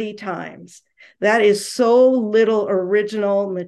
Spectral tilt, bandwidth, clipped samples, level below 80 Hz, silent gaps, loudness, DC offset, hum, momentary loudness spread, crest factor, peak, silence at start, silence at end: -5 dB/octave; 12.5 kHz; under 0.1%; -70 dBFS; none; -17 LUFS; under 0.1%; none; 14 LU; 14 dB; -4 dBFS; 0 s; 0 s